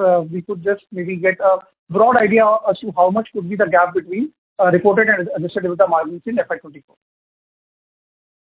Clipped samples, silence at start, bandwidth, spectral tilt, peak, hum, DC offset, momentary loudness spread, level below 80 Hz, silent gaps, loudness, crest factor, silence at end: under 0.1%; 0 s; 4 kHz; -10.5 dB/octave; 0 dBFS; none; under 0.1%; 11 LU; -60 dBFS; 1.78-1.87 s, 4.38-4.56 s; -17 LUFS; 18 dB; 1.65 s